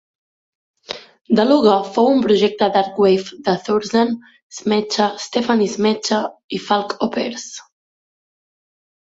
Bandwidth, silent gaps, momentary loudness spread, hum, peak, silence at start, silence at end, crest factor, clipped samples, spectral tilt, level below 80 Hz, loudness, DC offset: 8 kHz; 1.21-1.25 s, 4.43-4.50 s, 6.44-6.49 s; 16 LU; none; -2 dBFS; 0.9 s; 1.55 s; 16 dB; under 0.1%; -5 dB/octave; -62 dBFS; -17 LUFS; under 0.1%